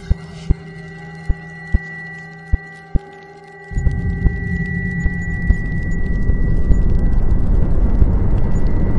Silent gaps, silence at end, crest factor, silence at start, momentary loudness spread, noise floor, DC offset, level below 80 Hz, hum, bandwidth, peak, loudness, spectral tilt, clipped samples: none; 0 s; 16 dB; 0 s; 14 LU; -38 dBFS; under 0.1%; -18 dBFS; none; 7.4 kHz; 0 dBFS; -21 LUFS; -8.5 dB/octave; under 0.1%